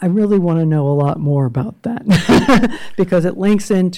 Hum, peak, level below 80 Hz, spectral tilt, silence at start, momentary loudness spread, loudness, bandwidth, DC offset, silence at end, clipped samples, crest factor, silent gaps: none; -4 dBFS; -38 dBFS; -7 dB/octave; 0 s; 9 LU; -15 LUFS; 15.5 kHz; under 0.1%; 0 s; under 0.1%; 10 dB; none